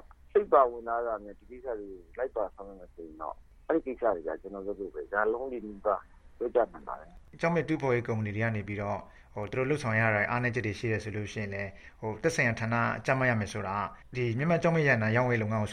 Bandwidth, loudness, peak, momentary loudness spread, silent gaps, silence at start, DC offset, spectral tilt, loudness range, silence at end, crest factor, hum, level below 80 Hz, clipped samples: 11.5 kHz; -30 LUFS; -10 dBFS; 15 LU; none; 0.35 s; under 0.1%; -7 dB/octave; 7 LU; 0 s; 22 dB; none; -56 dBFS; under 0.1%